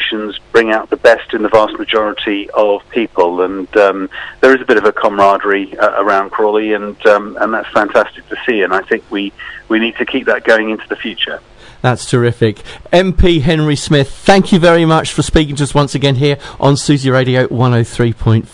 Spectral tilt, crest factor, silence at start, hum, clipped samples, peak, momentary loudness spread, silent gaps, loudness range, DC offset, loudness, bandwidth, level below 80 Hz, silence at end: -5.5 dB/octave; 12 dB; 0 s; none; 0.3%; 0 dBFS; 7 LU; none; 4 LU; under 0.1%; -12 LUFS; 11 kHz; -30 dBFS; 0.05 s